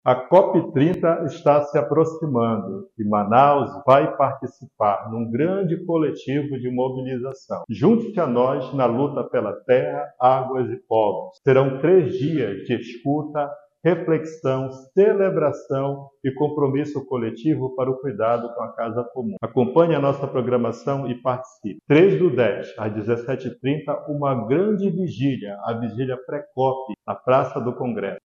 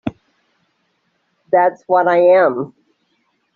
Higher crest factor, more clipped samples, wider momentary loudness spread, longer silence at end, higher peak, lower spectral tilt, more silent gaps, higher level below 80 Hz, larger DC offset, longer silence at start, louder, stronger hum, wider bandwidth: about the same, 18 dB vs 14 dB; neither; second, 11 LU vs 16 LU; second, 0.05 s vs 0.9 s; about the same, -2 dBFS vs -2 dBFS; first, -8.5 dB/octave vs -5 dB/octave; neither; about the same, -62 dBFS vs -60 dBFS; neither; about the same, 0.05 s vs 0.05 s; second, -21 LUFS vs -14 LUFS; neither; first, 7.4 kHz vs 4.5 kHz